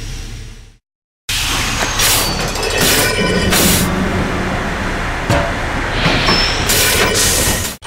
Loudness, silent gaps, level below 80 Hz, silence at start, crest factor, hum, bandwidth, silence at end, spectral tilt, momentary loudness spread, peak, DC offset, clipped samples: -14 LUFS; 0.95-1.28 s; -26 dBFS; 0 s; 16 dB; none; 16.5 kHz; 0 s; -2.5 dB/octave; 8 LU; 0 dBFS; under 0.1%; under 0.1%